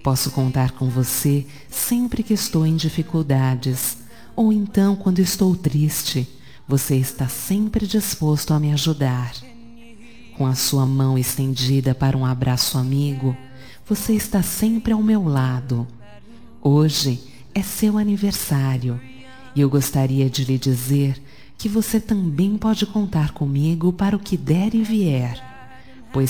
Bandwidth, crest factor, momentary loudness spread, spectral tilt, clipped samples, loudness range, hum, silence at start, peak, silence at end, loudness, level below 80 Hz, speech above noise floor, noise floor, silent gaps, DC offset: 19.5 kHz; 16 dB; 7 LU; -5.5 dB/octave; under 0.1%; 2 LU; none; 0.05 s; -4 dBFS; 0 s; -20 LUFS; -44 dBFS; 25 dB; -44 dBFS; none; 0.9%